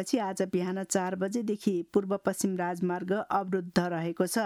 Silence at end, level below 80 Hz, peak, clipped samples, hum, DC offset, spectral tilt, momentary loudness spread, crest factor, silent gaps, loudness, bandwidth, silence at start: 0 s; -68 dBFS; -12 dBFS; under 0.1%; none; under 0.1%; -5.5 dB/octave; 2 LU; 18 dB; none; -30 LUFS; 15.5 kHz; 0 s